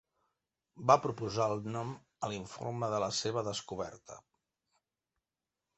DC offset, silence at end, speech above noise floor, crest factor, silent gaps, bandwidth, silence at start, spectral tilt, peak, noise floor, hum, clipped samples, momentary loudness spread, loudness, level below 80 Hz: under 0.1%; 1.6 s; over 56 dB; 26 dB; none; 8.2 kHz; 0.75 s; -4.5 dB/octave; -10 dBFS; under -90 dBFS; none; under 0.1%; 16 LU; -34 LUFS; -68 dBFS